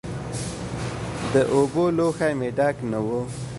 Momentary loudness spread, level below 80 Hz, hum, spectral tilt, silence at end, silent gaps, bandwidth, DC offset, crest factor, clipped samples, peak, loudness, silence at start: 10 LU; -46 dBFS; none; -6 dB/octave; 0 s; none; 11.5 kHz; under 0.1%; 18 dB; under 0.1%; -6 dBFS; -24 LUFS; 0.05 s